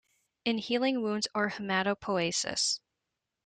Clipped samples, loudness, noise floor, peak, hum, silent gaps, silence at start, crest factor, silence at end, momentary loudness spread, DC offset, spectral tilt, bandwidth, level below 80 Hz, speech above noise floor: under 0.1%; -30 LUFS; -86 dBFS; -14 dBFS; none; none; 0.45 s; 18 dB; 0.7 s; 4 LU; under 0.1%; -3 dB/octave; 9.8 kHz; -70 dBFS; 56 dB